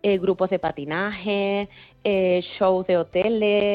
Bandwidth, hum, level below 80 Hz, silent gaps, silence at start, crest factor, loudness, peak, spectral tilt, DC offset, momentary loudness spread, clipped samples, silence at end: 5.2 kHz; none; -56 dBFS; none; 0.05 s; 14 dB; -23 LUFS; -8 dBFS; -8.5 dB/octave; under 0.1%; 6 LU; under 0.1%; 0 s